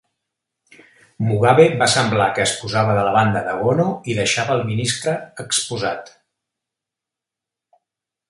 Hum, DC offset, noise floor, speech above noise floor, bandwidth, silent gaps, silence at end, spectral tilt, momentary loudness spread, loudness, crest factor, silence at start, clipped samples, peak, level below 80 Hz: none; under 0.1%; -86 dBFS; 68 dB; 11.5 kHz; none; 2.25 s; -4 dB/octave; 11 LU; -18 LUFS; 20 dB; 1.2 s; under 0.1%; 0 dBFS; -54 dBFS